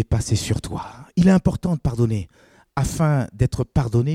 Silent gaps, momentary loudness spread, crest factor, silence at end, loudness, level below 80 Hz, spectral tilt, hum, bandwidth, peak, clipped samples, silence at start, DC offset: none; 13 LU; 16 dB; 0 s; -21 LUFS; -36 dBFS; -7 dB/octave; none; 15.5 kHz; -4 dBFS; under 0.1%; 0 s; under 0.1%